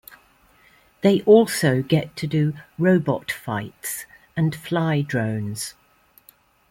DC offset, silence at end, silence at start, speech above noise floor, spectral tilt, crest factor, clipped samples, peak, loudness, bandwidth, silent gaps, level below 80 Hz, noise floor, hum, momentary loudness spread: under 0.1%; 1 s; 1.05 s; 36 dB; -6 dB/octave; 20 dB; under 0.1%; -2 dBFS; -22 LUFS; 16.5 kHz; none; -58 dBFS; -56 dBFS; none; 15 LU